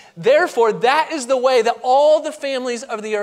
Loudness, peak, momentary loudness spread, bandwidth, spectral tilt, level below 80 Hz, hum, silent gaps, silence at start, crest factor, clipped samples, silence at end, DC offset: -17 LUFS; -2 dBFS; 10 LU; 14.5 kHz; -3 dB/octave; -74 dBFS; none; none; 0.15 s; 16 dB; under 0.1%; 0 s; under 0.1%